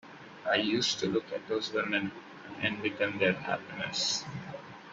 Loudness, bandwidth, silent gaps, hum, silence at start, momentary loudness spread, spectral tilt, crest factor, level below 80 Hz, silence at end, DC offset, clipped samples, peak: -31 LUFS; 8 kHz; none; none; 0.05 s; 15 LU; -3.5 dB/octave; 20 dB; -70 dBFS; 0 s; under 0.1%; under 0.1%; -14 dBFS